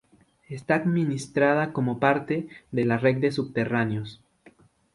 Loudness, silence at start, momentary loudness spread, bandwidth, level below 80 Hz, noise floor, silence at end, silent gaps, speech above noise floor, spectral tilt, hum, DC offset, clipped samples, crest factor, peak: -25 LUFS; 0.5 s; 10 LU; 11.5 kHz; -62 dBFS; -57 dBFS; 0.8 s; none; 32 dB; -7 dB/octave; none; under 0.1%; under 0.1%; 20 dB; -6 dBFS